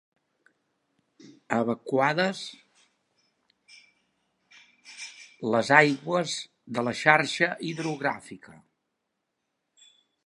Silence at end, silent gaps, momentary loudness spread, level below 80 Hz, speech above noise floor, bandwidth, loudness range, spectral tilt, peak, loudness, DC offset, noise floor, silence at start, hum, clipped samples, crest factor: 1.75 s; none; 21 LU; -78 dBFS; 55 dB; 11.5 kHz; 9 LU; -4.5 dB/octave; -2 dBFS; -25 LUFS; under 0.1%; -81 dBFS; 1.25 s; none; under 0.1%; 28 dB